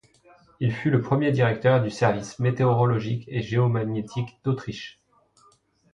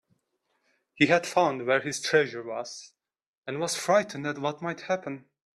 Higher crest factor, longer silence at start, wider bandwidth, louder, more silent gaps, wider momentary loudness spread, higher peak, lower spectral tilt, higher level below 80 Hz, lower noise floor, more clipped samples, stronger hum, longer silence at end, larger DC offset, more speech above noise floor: about the same, 20 dB vs 22 dB; second, 0.6 s vs 0.95 s; second, 8.4 kHz vs 13 kHz; first, -24 LUFS vs -27 LUFS; second, none vs 3.26-3.42 s; second, 9 LU vs 16 LU; about the same, -6 dBFS vs -6 dBFS; first, -7.5 dB/octave vs -4 dB/octave; first, -58 dBFS vs -74 dBFS; second, -61 dBFS vs -76 dBFS; neither; neither; first, 1.05 s vs 0.35 s; neither; second, 38 dB vs 49 dB